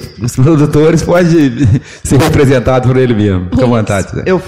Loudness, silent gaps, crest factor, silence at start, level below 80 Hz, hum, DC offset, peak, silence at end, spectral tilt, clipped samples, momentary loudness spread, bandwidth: -10 LUFS; none; 8 dB; 0 s; -30 dBFS; none; 2%; 0 dBFS; 0 s; -7 dB/octave; under 0.1%; 6 LU; 15.5 kHz